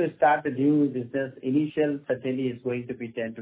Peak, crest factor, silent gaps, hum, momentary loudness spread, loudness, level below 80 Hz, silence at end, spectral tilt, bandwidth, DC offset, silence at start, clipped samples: -8 dBFS; 18 dB; none; none; 10 LU; -26 LUFS; -68 dBFS; 0 s; -11 dB/octave; 4 kHz; under 0.1%; 0 s; under 0.1%